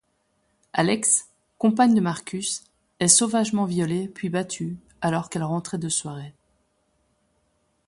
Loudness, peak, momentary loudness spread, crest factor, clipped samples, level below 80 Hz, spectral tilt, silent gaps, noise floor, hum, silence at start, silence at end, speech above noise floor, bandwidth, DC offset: -23 LUFS; 0 dBFS; 14 LU; 24 dB; under 0.1%; -64 dBFS; -4 dB/octave; none; -70 dBFS; none; 0.75 s; 1.55 s; 47 dB; 11.5 kHz; under 0.1%